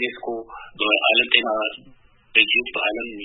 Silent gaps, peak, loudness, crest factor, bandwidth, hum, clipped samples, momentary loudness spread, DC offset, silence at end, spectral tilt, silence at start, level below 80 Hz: none; 0 dBFS; -19 LUFS; 22 dB; 4.1 kHz; none; under 0.1%; 15 LU; under 0.1%; 0 s; -6.5 dB/octave; 0 s; -58 dBFS